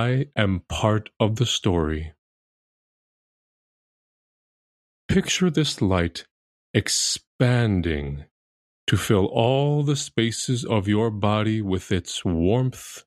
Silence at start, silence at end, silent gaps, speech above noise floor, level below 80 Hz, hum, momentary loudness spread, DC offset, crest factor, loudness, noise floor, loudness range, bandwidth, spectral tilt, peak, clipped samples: 0 s; 0.05 s; 2.18-5.09 s, 6.31-6.74 s, 7.27-7.39 s, 8.31-8.87 s; over 68 dB; -44 dBFS; none; 7 LU; under 0.1%; 20 dB; -23 LUFS; under -90 dBFS; 6 LU; 13.5 kHz; -5 dB/octave; -4 dBFS; under 0.1%